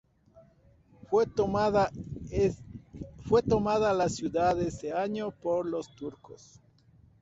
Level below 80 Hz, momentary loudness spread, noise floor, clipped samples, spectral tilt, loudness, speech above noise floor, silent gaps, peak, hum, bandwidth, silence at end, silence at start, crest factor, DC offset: -52 dBFS; 16 LU; -61 dBFS; under 0.1%; -6.5 dB/octave; -29 LUFS; 33 dB; none; -12 dBFS; none; 8 kHz; 0.85 s; 0.35 s; 18 dB; under 0.1%